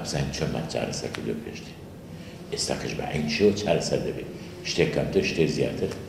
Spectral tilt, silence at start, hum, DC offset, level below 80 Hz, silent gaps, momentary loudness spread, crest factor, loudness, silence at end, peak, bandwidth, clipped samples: -5 dB/octave; 0 s; none; under 0.1%; -48 dBFS; none; 18 LU; 22 dB; -27 LUFS; 0 s; -6 dBFS; 15.5 kHz; under 0.1%